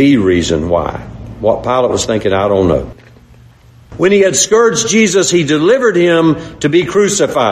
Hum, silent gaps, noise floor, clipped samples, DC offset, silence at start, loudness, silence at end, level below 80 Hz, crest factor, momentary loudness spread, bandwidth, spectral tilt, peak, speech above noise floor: none; none; -41 dBFS; under 0.1%; under 0.1%; 0 s; -11 LUFS; 0 s; -34 dBFS; 12 dB; 7 LU; 13.5 kHz; -4 dB/octave; 0 dBFS; 30 dB